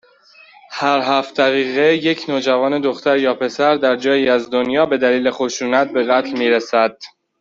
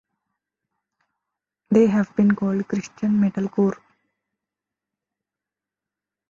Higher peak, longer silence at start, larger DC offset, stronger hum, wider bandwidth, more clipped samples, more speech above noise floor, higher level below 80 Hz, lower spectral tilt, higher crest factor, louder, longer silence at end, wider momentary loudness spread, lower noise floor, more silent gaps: first, -2 dBFS vs -6 dBFS; second, 0.7 s vs 1.7 s; neither; second, none vs 50 Hz at -40 dBFS; about the same, 7.6 kHz vs 7.4 kHz; neither; second, 32 dB vs 68 dB; about the same, -62 dBFS vs -62 dBFS; second, -4 dB/octave vs -8.5 dB/octave; second, 14 dB vs 20 dB; first, -16 LUFS vs -21 LUFS; second, 0.35 s vs 2.55 s; second, 4 LU vs 8 LU; second, -48 dBFS vs -88 dBFS; neither